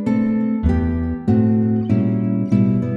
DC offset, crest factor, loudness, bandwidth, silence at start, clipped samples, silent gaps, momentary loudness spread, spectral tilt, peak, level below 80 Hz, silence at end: under 0.1%; 12 dB; -18 LUFS; 4.7 kHz; 0 s; under 0.1%; none; 3 LU; -11 dB/octave; -4 dBFS; -30 dBFS; 0 s